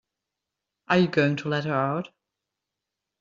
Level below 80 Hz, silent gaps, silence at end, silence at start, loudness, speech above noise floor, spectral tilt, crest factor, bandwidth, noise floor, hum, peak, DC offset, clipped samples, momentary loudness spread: -68 dBFS; none; 1.15 s; 0.9 s; -25 LUFS; 62 dB; -5 dB/octave; 22 dB; 7.6 kHz; -86 dBFS; none; -6 dBFS; under 0.1%; under 0.1%; 9 LU